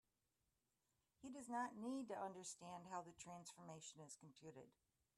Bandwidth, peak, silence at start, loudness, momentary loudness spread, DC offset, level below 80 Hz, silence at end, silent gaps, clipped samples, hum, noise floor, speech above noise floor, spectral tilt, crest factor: 13 kHz; -36 dBFS; 1.2 s; -54 LUFS; 13 LU; under 0.1%; -90 dBFS; 0.45 s; none; under 0.1%; none; -90 dBFS; 36 dB; -4 dB/octave; 20 dB